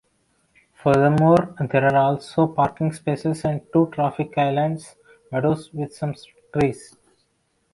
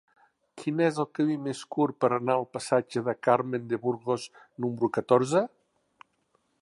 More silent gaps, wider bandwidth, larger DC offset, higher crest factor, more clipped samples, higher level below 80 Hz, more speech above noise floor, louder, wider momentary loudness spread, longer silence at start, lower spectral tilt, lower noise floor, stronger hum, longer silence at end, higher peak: neither; about the same, 11.5 kHz vs 11.5 kHz; neither; about the same, 18 dB vs 20 dB; neither; first, -54 dBFS vs -74 dBFS; about the same, 48 dB vs 45 dB; first, -21 LUFS vs -28 LUFS; first, 13 LU vs 9 LU; first, 0.85 s vs 0.55 s; first, -8 dB/octave vs -6 dB/octave; second, -68 dBFS vs -72 dBFS; neither; second, 0.9 s vs 1.15 s; first, -4 dBFS vs -8 dBFS